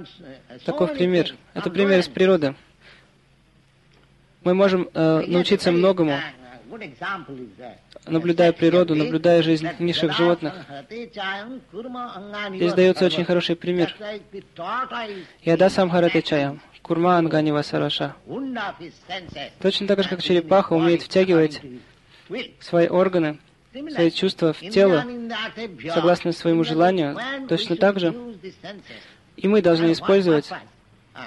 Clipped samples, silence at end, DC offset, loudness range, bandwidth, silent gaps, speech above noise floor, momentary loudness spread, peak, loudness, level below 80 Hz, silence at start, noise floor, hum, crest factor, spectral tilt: under 0.1%; 0 s; under 0.1%; 3 LU; 11.5 kHz; none; 36 dB; 18 LU; -6 dBFS; -21 LUFS; -60 dBFS; 0 s; -57 dBFS; none; 16 dB; -6.5 dB/octave